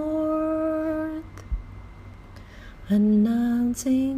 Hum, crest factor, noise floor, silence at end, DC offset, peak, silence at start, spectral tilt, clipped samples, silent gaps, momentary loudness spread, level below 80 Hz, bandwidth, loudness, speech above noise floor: none; 12 dB; -43 dBFS; 0 s; under 0.1%; -12 dBFS; 0 s; -7 dB/octave; under 0.1%; none; 24 LU; -40 dBFS; 15.5 kHz; -24 LUFS; 22 dB